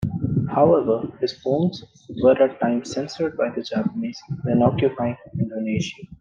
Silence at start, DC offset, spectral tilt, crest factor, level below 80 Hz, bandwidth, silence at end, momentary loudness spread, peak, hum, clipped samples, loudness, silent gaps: 0 s; under 0.1%; -7.5 dB/octave; 18 dB; -52 dBFS; 9 kHz; 0.05 s; 12 LU; -4 dBFS; none; under 0.1%; -22 LUFS; none